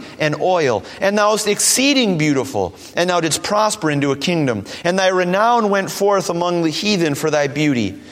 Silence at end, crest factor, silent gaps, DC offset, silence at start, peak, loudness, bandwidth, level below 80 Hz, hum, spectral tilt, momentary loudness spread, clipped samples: 0 s; 16 dB; none; under 0.1%; 0 s; 0 dBFS; -17 LUFS; 16.5 kHz; -56 dBFS; none; -4 dB/octave; 6 LU; under 0.1%